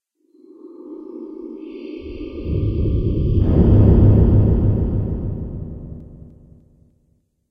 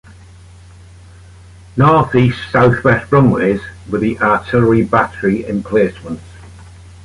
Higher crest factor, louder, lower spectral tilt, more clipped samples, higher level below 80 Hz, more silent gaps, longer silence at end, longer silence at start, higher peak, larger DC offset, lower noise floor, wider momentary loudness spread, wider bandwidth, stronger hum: about the same, 16 dB vs 14 dB; second, -17 LUFS vs -14 LUFS; first, -12.5 dB/octave vs -8.5 dB/octave; neither; first, -24 dBFS vs -40 dBFS; neither; first, 1.35 s vs 0.4 s; second, 0.65 s vs 1.75 s; about the same, -2 dBFS vs -2 dBFS; neither; first, -63 dBFS vs -39 dBFS; first, 22 LU vs 11 LU; second, 3.6 kHz vs 11.5 kHz; neither